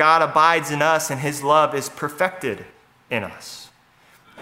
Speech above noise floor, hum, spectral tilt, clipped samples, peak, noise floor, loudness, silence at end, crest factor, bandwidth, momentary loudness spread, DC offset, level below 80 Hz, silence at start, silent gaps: 35 dB; none; -3.5 dB/octave; under 0.1%; 0 dBFS; -54 dBFS; -20 LUFS; 0 s; 20 dB; 16 kHz; 18 LU; under 0.1%; -66 dBFS; 0 s; none